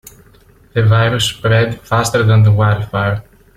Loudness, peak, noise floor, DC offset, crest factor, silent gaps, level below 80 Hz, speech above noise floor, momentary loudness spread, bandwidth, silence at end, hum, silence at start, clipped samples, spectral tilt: -14 LUFS; -2 dBFS; -46 dBFS; under 0.1%; 12 dB; none; -40 dBFS; 34 dB; 8 LU; 14 kHz; 0.35 s; none; 0.75 s; under 0.1%; -5.5 dB/octave